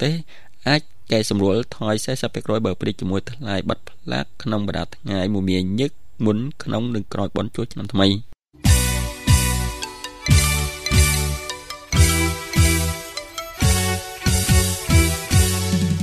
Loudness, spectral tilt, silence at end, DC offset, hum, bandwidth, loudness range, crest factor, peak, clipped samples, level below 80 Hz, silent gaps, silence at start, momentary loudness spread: -21 LUFS; -4.5 dB/octave; 0 s; under 0.1%; none; 14.5 kHz; 5 LU; 18 dB; -2 dBFS; under 0.1%; -28 dBFS; none; 0 s; 10 LU